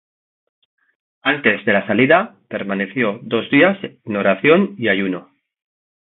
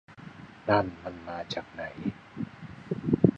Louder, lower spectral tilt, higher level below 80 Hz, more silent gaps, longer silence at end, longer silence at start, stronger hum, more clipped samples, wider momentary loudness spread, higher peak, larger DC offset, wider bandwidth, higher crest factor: first, -17 LUFS vs -32 LUFS; first, -10.5 dB/octave vs -8 dB/octave; second, -62 dBFS vs -56 dBFS; neither; first, 0.9 s vs 0 s; first, 1.25 s vs 0.1 s; neither; neither; second, 11 LU vs 19 LU; first, 0 dBFS vs -4 dBFS; neither; second, 4.1 kHz vs 7.8 kHz; second, 18 dB vs 28 dB